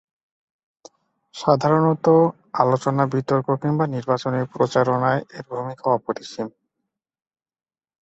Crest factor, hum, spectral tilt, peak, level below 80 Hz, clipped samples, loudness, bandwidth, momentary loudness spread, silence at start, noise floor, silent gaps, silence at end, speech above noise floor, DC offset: 20 dB; none; -7.5 dB/octave; -2 dBFS; -62 dBFS; under 0.1%; -21 LUFS; 8.2 kHz; 13 LU; 1.35 s; under -90 dBFS; none; 1.5 s; over 70 dB; under 0.1%